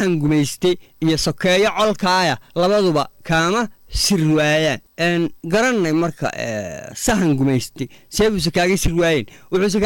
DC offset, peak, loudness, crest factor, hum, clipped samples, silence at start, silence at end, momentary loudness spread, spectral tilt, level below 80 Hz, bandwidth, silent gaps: under 0.1%; -8 dBFS; -18 LUFS; 10 dB; none; under 0.1%; 0 s; 0 s; 8 LU; -4.5 dB/octave; -36 dBFS; 18 kHz; none